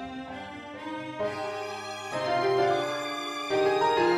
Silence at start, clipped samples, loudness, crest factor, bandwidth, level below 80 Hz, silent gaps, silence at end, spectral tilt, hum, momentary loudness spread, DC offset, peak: 0 s; under 0.1%; -29 LUFS; 16 dB; 13.5 kHz; -64 dBFS; none; 0 s; -4.5 dB/octave; none; 14 LU; under 0.1%; -14 dBFS